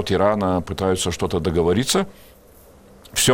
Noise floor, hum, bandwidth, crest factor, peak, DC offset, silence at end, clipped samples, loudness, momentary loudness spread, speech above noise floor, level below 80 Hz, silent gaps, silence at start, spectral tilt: -48 dBFS; none; 17 kHz; 20 dB; 0 dBFS; under 0.1%; 0 s; under 0.1%; -21 LUFS; 4 LU; 28 dB; -42 dBFS; none; 0 s; -4 dB/octave